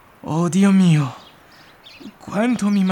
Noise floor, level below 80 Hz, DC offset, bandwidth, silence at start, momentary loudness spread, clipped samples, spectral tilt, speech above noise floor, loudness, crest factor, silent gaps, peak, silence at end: -47 dBFS; -62 dBFS; under 0.1%; 11.5 kHz; 0.25 s; 24 LU; under 0.1%; -7 dB/octave; 31 dB; -18 LUFS; 16 dB; none; -4 dBFS; 0 s